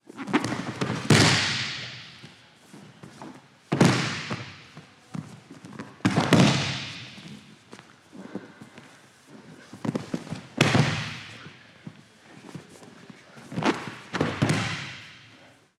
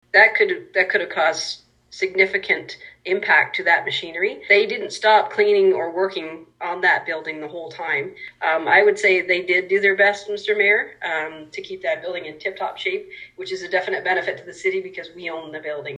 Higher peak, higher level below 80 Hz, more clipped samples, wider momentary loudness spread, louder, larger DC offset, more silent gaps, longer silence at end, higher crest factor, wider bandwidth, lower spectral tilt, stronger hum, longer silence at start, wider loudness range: about the same, -2 dBFS vs -2 dBFS; first, -58 dBFS vs -68 dBFS; neither; first, 26 LU vs 15 LU; second, -25 LUFS vs -19 LUFS; neither; neither; first, 0.6 s vs 0.05 s; first, 26 dB vs 20 dB; first, 14 kHz vs 10.5 kHz; first, -4.5 dB/octave vs -3 dB/octave; neither; about the same, 0.15 s vs 0.15 s; about the same, 9 LU vs 7 LU